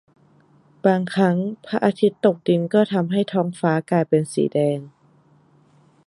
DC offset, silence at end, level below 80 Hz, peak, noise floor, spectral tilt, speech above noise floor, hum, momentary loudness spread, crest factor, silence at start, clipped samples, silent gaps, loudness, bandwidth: under 0.1%; 1.2 s; -68 dBFS; -4 dBFS; -56 dBFS; -7 dB/octave; 36 dB; none; 4 LU; 18 dB; 0.85 s; under 0.1%; none; -21 LUFS; 11.5 kHz